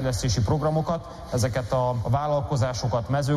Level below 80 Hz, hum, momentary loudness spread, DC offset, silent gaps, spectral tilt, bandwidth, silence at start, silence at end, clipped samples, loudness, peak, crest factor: -40 dBFS; none; 4 LU; under 0.1%; none; -6 dB/octave; 13.5 kHz; 0 s; 0 s; under 0.1%; -25 LUFS; -12 dBFS; 12 dB